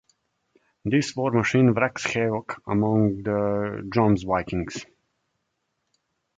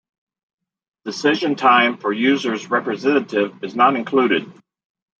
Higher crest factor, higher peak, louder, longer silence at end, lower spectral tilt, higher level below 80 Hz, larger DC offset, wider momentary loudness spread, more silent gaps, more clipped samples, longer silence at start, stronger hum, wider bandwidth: about the same, 20 dB vs 18 dB; about the same, -4 dBFS vs -2 dBFS; second, -24 LUFS vs -18 LUFS; first, 1.55 s vs 0.7 s; first, -6.5 dB/octave vs -4.5 dB/octave; first, -52 dBFS vs -72 dBFS; neither; about the same, 10 LU vs 8 LU; neither; neither; second, 0.85 s vs 1.05 s; neither; first, 9.2 kHz vs 7.8 kHz